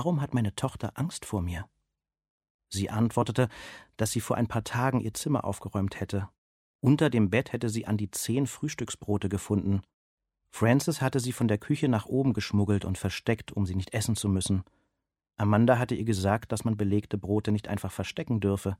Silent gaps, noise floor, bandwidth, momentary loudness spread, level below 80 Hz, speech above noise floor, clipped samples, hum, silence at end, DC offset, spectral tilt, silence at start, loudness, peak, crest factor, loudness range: 2.30-2.38 s, 2.50-2.59 s, 6.38-6.79 s, 9.94-10.18 s; -84 dBFS; 16 kHz; 9 LU; -54 dBFS; 56 dB; under 0.1%; none; 0.05 s; under 0.1%; -6 dB/octave; 0 s; -29 LUFS; -8 dBFS; 20 dB; 4 LU